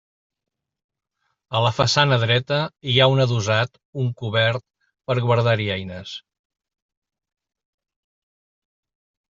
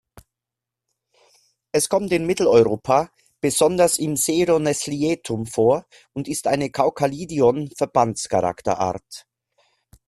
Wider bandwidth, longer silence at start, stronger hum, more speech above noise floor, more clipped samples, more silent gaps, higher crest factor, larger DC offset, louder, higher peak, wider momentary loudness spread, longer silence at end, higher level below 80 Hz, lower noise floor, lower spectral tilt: second, 7.6 kHz vs 14 kHz; second, 1.5 s vs 1.75 s; neither; second, 54 dB vs 66 dB; neither; first, 3.85-3.93 s vs none; about the same, 20 dB vs 18 dB; neither; about the same, -20 LUFS vs -20 LUFS; about the same, -2 dBFS vs -2 dBFS; first, 14 LU vs 9 LU; first, 3.2 s vs 0.85 s; about the same, -58 dBFS vs -56 dBFS; second, -74 dBFS vs -86 dBFS; about the same, -5 dB/octave vs -4.5 dB/octave